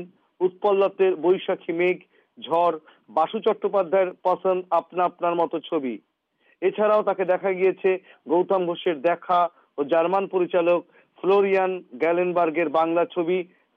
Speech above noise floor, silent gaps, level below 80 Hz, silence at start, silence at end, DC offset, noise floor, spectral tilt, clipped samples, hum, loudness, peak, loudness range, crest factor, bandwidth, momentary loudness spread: 43 dB; none; -78 dBFS; 0 s; 0.3 s; under 0.1%; -65 dBFS; -8 dB/octave; under 0.1%; none; -23 LUFS; -10 dBFS; 2 LU; 12 dB; 4.9 kHz; 7 LU